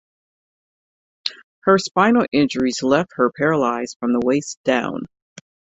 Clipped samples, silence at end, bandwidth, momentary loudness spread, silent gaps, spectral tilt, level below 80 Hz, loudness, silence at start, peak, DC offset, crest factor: under 0.1%; 0.75 s; 8.2 kHz; 12 LU; 1.44-1.62 s, 3.96-4.00 s, 4.57-4.64 s; -5 dB/octave; -58 dBFS; -19 LUFS; 1.25 s; -2 dBFS; under 0.1%; 18 dB